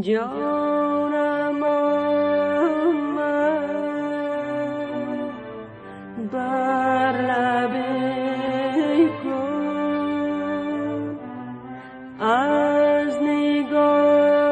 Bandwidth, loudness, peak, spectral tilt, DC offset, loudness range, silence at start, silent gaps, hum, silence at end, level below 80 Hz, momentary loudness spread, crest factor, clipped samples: 8.8 kHz; -22 LUFS; -8 dBFS; -6.5 dB/octave; under 0.1%; 5 LU; 0 s; none; none; 0 s; -62 dBFS; 14 LU; 14 dB; under 0.1%